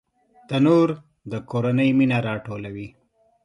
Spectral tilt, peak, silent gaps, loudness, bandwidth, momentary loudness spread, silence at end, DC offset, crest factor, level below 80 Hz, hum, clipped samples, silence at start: -8 dB/octave; -6 dBFS; none; -21 LUFS; 10.5 kHz; 17 LU; 0.55 s; under 0.1%; 16 dB; -60 dBFS; none; under 0.1%; 0.5 s